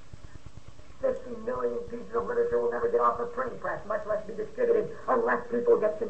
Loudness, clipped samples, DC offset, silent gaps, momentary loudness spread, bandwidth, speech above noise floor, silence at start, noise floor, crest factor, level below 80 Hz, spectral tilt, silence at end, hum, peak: -29 LUFS; under 0.1%; 0.9%; none; 10 LU; 8.4 kHz; 22 dB; 0.25 s; -50 dBFS; 18 dB; -56 dBFS; -7 dB/octave; 0 s; none; -12 dBFS